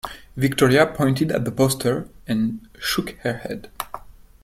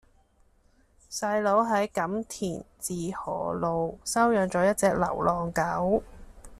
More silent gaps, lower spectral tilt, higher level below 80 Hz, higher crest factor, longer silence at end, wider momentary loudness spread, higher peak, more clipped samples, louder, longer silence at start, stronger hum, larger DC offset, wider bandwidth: neither; about the same, -5.5 dB/octave vs -5 dB/octave; about the same, -48 dBFS vs -52 dBFS; about the same, 20 dB vs 18 dB; first, 0.35 s vs 0 s; first, 17 LU vs 10 LU; first, -2 dBFS vs -10 dBFS; neither; first, -21 LUFS vs -27 LUFS; second, 0.05 s vs 1.1 s; neither; neither; first, 16.5 kHz vs 14 kHz